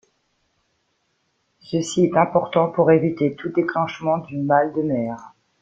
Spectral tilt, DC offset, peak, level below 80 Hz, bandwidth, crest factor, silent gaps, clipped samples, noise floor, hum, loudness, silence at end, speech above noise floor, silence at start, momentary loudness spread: -6.5 dB/octave; under 0.1%; -2 dBFS; -62 dBFS; 9.2 kHz; 20 dB; none; under 0.1%; -69 dBFS; none; -20 LUFS; 0.35 s; 50 dB; 1.7 s; 9 LU